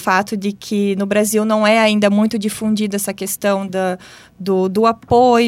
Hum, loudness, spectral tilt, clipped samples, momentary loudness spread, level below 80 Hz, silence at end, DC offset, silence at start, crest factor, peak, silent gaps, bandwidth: none; -16 LUFS; -4.5 dB/octave; under 0.1%; 9 LU; -52 dBFS; 0 s; under 0.1%; 0 s; 14 dB; -2 dBFS; none; 16.5 kHz